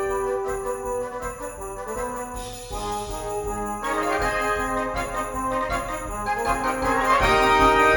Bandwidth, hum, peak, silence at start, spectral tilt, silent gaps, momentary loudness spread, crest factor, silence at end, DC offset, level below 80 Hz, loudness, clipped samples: 19 kHz; none; -4 dBFS; 0 s; -4 dB/octave; none; 14 LU; 20 dB; 0 s; under 0.1%; -38 dBFS; -24 LUFS; under 0.1%